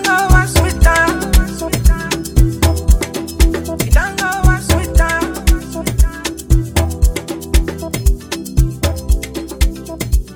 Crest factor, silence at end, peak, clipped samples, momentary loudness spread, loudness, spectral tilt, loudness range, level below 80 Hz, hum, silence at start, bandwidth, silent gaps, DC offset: 14 dB; 0 s; 0 dBFS; under 0.1%; 8 LU; -16 LUFS; -4.5 dB/octave; 4 LU; -16 dBFS; none; 0 s; 18 kHz; none; under 0.1%